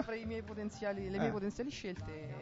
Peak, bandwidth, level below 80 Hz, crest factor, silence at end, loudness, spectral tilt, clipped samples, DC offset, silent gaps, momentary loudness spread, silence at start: -22 dBFS; 7.6 kHz; -58 dBFS; 18 dB; 0 s; -40 LUFS; -5.5 dB/octave; under 0.1%; under 0.1%; none; 7 LU; 0 s